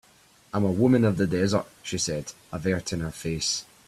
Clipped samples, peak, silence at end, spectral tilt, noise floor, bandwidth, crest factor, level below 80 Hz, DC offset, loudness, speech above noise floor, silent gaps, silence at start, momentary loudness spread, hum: under 0.1%; -8 dBFS; 0.25 s; -5 dB/octave; -58 dBFS; 14 kHz; 18 dB; -54 dBFS; under 0.1%; -26 LUFS; 32 dB; none; 0.55 s; 12 LU; none